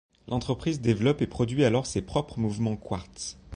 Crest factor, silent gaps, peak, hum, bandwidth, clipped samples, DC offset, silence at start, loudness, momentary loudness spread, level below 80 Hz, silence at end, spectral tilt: 16 dB; none; -10 dBFS; none; 10.5 kHz; under 0.1%; under 0.1%; 0.25 s; -28 LUFS; 10 LU; -48 dBFS; 0 s; -6 dB/octave